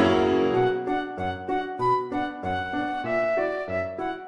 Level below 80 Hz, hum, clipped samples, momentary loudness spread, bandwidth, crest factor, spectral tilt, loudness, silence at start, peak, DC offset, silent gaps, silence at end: -54 dBFS; none; under 0.1%; 8 LU; 9 kHz; 16 dB; -7 dB/octave; -26 LUFS; 0 s; -10 dBFS; under 0.1%; none; 0 s